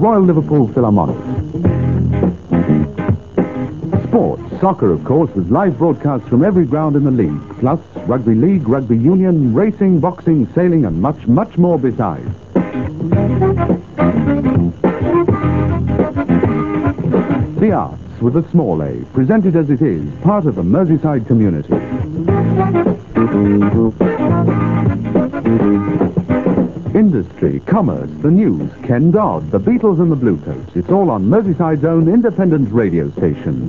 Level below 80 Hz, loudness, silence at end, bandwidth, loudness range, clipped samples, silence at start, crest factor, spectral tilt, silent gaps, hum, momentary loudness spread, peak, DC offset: -36 dBFS; -14 LUFS; 0 s; 4.2 kHz; 2 LU; under 0.1%; 0 s; 14 dB; -11 dB/octave; none; none; 6 LU; 0 dBFS; 0.5%